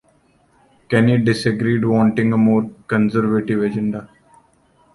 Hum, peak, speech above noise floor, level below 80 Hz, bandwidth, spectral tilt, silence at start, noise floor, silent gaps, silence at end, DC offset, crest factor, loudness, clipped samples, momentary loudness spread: none; -2 dBFS; 41 dB; -52 dBFS; 11.5 kHz; -7.5 dB/octave; 0.9 s; -57 dBFS; none; 0.9 s; under 0.1%; 16 dB; -17 LUFS; under 0.1%; 6 LU